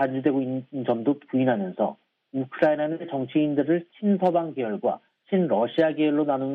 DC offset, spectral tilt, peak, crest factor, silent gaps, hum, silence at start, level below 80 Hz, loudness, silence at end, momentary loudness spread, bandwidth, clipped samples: under 0.1%; -9.5 dB/octave; -8 dBFS; 16 dB; none; none; 0 s; -74 dBFS; -25 LUFS; 0 s; 7 LU; 4.8 kHz; under 0.1%